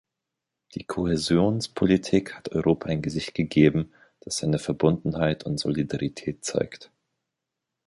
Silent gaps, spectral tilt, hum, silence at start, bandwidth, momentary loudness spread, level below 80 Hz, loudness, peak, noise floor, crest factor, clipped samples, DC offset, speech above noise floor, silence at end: none; -6 dB/octave; none; 0.75 s; 11.5 kHz; 11 LU; -50 dBFS; -25 LUFS; -4 dBFS; -85 dBFS; 20 dB; under 0.1%; under 0.1%; 61 dB; 1.05 s